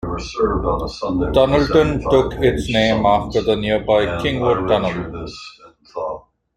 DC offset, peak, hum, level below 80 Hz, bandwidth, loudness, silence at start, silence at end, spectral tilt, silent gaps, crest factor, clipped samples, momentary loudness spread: under 0.1%; 0 dBFS; none; -34 dBFS; 13.5 kHz; -18 LUFS; 0.05 s; 0.35 s; -6.5 dB/octave; none; 18 dB; under 0.1%; 14 LU